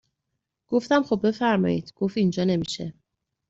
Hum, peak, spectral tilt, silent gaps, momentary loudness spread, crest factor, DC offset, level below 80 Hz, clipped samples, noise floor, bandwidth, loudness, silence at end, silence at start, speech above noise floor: none; -8 dBFS; -6.5 dB/octave; none; 8 LU; 16 dB; under 0.1%; -62 dBFS; under 0.1%; -81 dBFS; 8 kHz; -24 LUFS; 0.6 s; 0.7 s; 58 dB